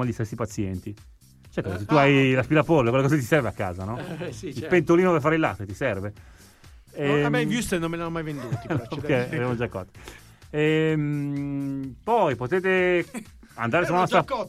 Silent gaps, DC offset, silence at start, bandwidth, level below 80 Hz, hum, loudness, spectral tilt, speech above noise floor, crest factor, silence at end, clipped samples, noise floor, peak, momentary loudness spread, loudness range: none; under 0.1%; 0 s; 15 kHz; -50 dBFS; none; -24 LUFS; -6.5 dB/octave; 26 dB; 20 dB; 0 s; under 0.1%; -50 dBFS; -4 dBFS; 14 LU; 5 LU